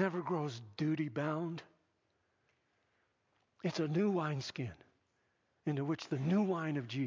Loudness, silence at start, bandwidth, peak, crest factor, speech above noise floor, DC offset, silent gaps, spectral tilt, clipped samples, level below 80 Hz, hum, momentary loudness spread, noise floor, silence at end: -37 LUFS; 0 s; 7.6 kHz; -20 dBFS; 18 dB; 43 dB; under 0.1%; none; -7 dB/octave; under 0.1%; -74 dBFS; none; 10 LU; -79 dBFS; 0 s